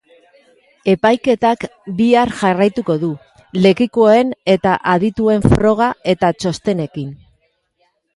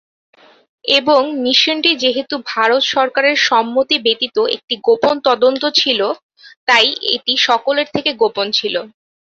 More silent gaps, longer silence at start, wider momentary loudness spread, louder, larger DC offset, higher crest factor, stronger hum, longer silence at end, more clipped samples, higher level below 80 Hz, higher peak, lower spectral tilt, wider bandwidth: second, none vs 4.64-4.68 s, 6.23-6.29 s, 6.56-6.67 s; about the same, 0.85 s vs 0.85 s; first, 11 LU vs 6 LU; about the same, -15 LUFS vs -14 LUFS; neither; about the same, 16 dB vs 16 dB; neither; first, 1 s vs 0.5 s; neither; first, -38 dBFS vs -62 dBFS; about the same, 0 dBFS vs 0 dBFS; first, -6.5 dB/octave vs -2 dB/octave; first, 11.5 kHz vs 7.8 kHz